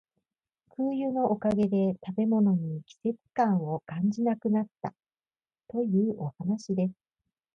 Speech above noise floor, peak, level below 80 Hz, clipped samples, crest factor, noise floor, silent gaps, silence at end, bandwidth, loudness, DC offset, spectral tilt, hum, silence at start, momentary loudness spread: over 62 dB; -14 dBFS; -68 dBFS; under 0.1%; 16 dB; under -90 dBFS; none; 0.65 s; 7.2 kHz; -29 LUFS; under 0.1%; -9 dB/octave; none; 0.8 s; 9 LU